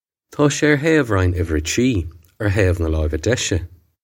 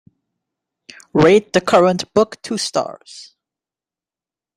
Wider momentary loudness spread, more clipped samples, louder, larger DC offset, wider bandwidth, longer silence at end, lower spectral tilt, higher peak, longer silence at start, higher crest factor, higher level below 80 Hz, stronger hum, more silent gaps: second, 9 LU vs 15 LU; neither; second, -19 LUFS vs -16 LUFS; neither; first, 16.5 kHz vs 14.5 kHz; second, 0.35 s vs 1.35 s; about the same, -5.5 dB/octave vs -5 dB/octave; about the same, 0 dBFS vs 0 dBFS; second, 0.3 s vs 1.15 s; about the same, 18 dB vs 18 dB; first, -32 dBFS vs -56 dBFS; neither; neither